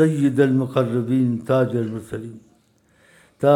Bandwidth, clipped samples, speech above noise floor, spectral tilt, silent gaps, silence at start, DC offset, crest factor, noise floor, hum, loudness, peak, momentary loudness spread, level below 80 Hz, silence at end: 12.5 kHz; under 0.1%; 39 dB; -8 dB/octave; none; 0 s; under 0.1%; 18 dB; -59 dBFS; none; -20 LUFS; -4 dBFS; 14 LU; -62 dBFS; 0 s